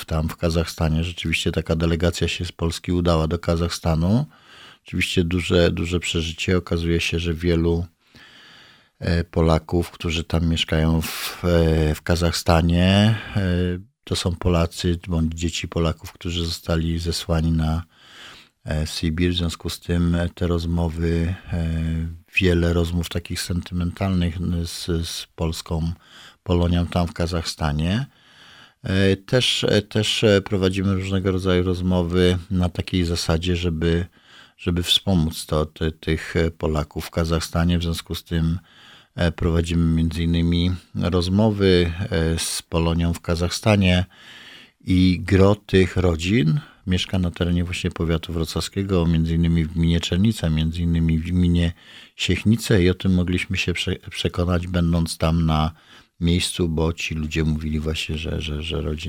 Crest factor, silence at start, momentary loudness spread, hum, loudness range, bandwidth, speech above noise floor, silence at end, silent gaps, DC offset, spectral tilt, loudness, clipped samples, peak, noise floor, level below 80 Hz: 20 dB; 0 s; 8 LU; none; 4 LU; 16.5 kHz; 29 dB; 0 s; none; under 0.1%; -6 dB/octave; -22 LUFS; under 0.1%; -2 dBFS; -50 dBFS; -34 dBFS